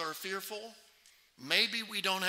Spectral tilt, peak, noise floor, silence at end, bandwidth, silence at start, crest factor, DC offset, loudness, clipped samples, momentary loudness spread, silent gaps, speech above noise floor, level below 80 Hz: -1.5 dB/octave; -12 dBFS; -64 dBFS; 0 s; 16 kHz; 0 s; 24 dB; under 0.1%; -32 LUFS; under 0.1%; 20 LU; none; 30 dB; -86 dBFS